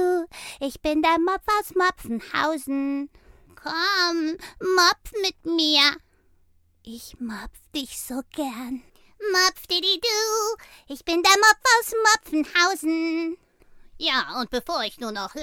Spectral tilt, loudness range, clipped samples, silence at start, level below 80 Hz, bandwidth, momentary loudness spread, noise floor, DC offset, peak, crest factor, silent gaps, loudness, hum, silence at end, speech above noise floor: -1 dB/octave; 6 LU; under 0.1%; 0 s; -54 dBFS; 19.5 kHz; 17 LU; -60 dBFS; under 0.1%; -4 dBFS; 20 dB; none; -22 LUFS; none; 0 s; 37 dB